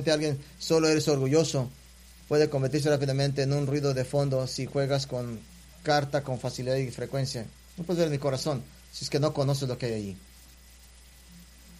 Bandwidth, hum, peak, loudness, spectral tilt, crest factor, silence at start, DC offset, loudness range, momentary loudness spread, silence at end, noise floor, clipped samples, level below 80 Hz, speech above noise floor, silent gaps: 15 kHz; none; -10 dBFS; -28 LUFS; -5.5 dB/octave; 18 dB; 0 s; under 0.1%; 5 LU; 12 LU; 0 s; -52 dBFS; under 0.1%; -54 dBFS; 25 dB; none